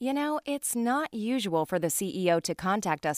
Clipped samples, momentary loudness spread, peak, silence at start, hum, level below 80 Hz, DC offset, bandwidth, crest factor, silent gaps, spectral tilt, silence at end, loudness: under 0.1%; 3 LU; -12 dBFS; 0 s; none; -66 dBFS; under 0.1%; 15.5 kHz; 16 dB; none; -4 dB/octave; 0 s; -29 LUFS